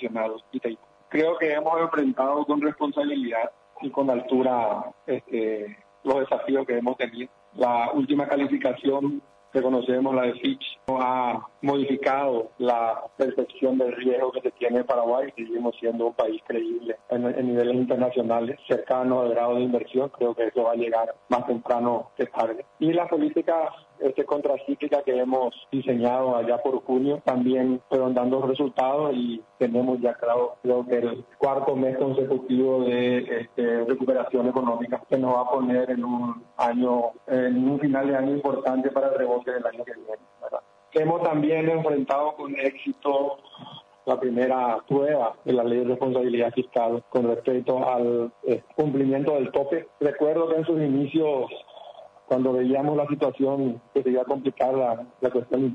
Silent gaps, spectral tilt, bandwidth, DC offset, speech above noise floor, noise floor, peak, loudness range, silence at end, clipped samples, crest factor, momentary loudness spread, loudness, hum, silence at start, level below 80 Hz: none; -8 dB/octave; 6.8 kHz; under 0.1%; 22 dB; -46 dBFS; -10 dBFS; 2 LU; 0 s; under 0.1%; 14 dB; 6 LU; -25 LUFS; none; 0 s; -70 dBFS